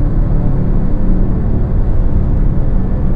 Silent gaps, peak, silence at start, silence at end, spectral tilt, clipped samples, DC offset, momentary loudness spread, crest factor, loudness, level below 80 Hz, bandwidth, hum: none; -2 dBFS; 0 s; 0 s; -12 dB/octave; under 0.1%; under 0.1%; 1 LU; 10 dB; -16 LUFS; -12 dBFS; 2.3 kHz; none